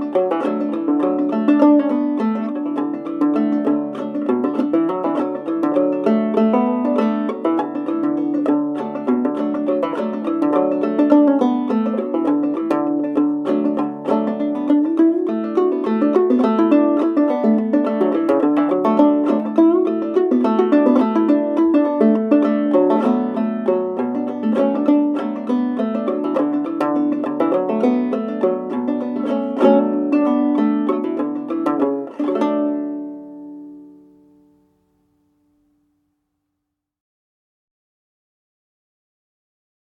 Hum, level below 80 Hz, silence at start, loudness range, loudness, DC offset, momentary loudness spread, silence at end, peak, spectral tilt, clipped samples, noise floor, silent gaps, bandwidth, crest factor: none; -70 dBFS; 0 s; 4 LU; -18 LUFS; under 0.1%; 7 LU; 5.95 s; -2 dBFS; -8.5 dB/octave; under 0.1%; -79 dBFS; none; 5.6 kHz; 16 dB